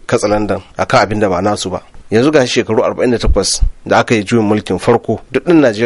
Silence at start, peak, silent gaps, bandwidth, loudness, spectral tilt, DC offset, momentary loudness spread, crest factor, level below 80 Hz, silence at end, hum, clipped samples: 0.1 s; 0 dBFS; none; 11.5 kHz; -13 LUFS; -5 dB/octave; under 0.1%; 7 LU; 12 dB; -24 dBFS; 0 s; none; under 0.1%